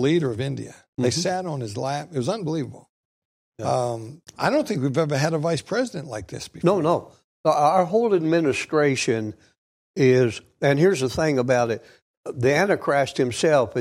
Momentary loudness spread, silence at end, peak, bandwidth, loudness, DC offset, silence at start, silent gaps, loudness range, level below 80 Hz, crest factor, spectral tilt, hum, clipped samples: 14 LU; 0 s; -6 dBFS; 14.5 kHz; -22 LUFS; under 0.1%; 0 s; 0.88-0.93 s, 2.89-3.52 s, 7.24-7.44 s, 9.58-9.94 s, 12.02-12.23 s; 6 LU; -58 dBFS; 16 dB; -5.5 dB/octave; none; under 0.1%